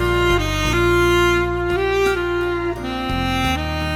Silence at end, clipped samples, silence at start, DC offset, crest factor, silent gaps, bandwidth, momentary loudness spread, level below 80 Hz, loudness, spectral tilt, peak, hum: 0 s; under 0.1%; 0 s; under 0.1%; 14 dB; none; 16.5 kHz; 7 LU; -28 dBFS; -19 LUFS; -5.5 dB/octave; -4 dBFS; none